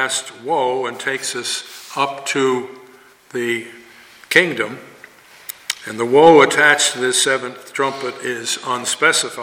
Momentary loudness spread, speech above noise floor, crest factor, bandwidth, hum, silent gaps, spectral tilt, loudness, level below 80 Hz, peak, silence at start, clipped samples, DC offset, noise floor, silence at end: 16 LU; 28 dB; 18 dB; 17 kHz; none; none; -2 dB/octave; -17 LUFS; -66 dBFS; 0 dBFS; 0 s; under 0.1%; under 0.1%; -46 dBFS; 0 s